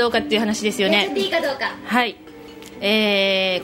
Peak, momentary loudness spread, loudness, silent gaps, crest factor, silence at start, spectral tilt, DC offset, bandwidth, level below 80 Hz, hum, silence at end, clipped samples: -2 dBFS; 9 LU; -19 LUFS; none; 18 dB; 0 s; -3.5 dB/octave; under 0.1%; 16 kHz; -56 dBFS; none; 0 s; under 0.1%